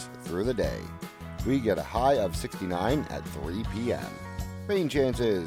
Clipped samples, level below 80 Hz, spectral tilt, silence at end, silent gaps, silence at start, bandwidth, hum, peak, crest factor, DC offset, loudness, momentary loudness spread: under 0.1%; -42 dBFS; -6 dB/octave; 0 s; none; 0 s; 18 kHz; none; -12 dBFS; 18 dB; under 0.1%; -29 LUFS; 12 LU